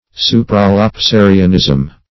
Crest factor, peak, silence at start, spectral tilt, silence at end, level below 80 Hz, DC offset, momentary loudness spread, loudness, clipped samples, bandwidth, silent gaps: 10 dB; 0 dBFS; 0.15 s; -6.5 dB/octave; 0.2 s; -30 dBFS; under 0.1%; 4 LU; -10 LUFS; 0.6%; 6 kHz; none